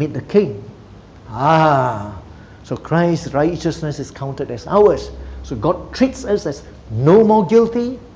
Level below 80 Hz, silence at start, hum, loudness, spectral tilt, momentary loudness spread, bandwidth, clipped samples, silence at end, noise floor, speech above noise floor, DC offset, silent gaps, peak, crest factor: -40 dBFS; 0 s; none; -16 LUFS; -7 dB/octave; 17 LU; 8 kHz; under 0.1%; 0.05 s; -40 dBFS; 24 dB; under 0.1%; none; 0 dBFS; 16 dB